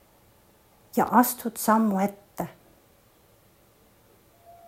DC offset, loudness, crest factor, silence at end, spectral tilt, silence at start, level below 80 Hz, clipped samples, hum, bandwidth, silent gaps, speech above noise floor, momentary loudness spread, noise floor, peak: under 0.1%; -25 LUFS; 24 dB; 2.15 s; -5 dB/octave; 0.95 s; -66 dBFS; under 0.1%; none; 16 kHz; none; 37 dB; 16 LU; -59 dBFS; -4 dBFS